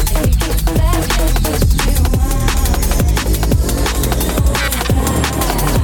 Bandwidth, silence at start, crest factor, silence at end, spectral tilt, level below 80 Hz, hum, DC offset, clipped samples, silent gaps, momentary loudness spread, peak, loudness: 19.5 kHz; 0 s; 10 dB; 0 s; -4.5 dB/octave; -16 dBFS; none; under 0.1%; under 0.1%; none; 1 LU; -2 dBFS; -15 LUFS